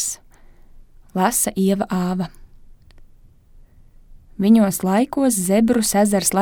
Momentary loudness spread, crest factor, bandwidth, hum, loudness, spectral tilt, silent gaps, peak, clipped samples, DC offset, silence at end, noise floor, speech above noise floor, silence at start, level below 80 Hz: 10 LU; 16 dB; 20 kHz; none; -18 LUFS; -5 dB/octave; none; -4 dBFS; under 0.1%; under 0.1%; 0 s; -48 dBFS; 30 dB; 0 s; -46 dBFS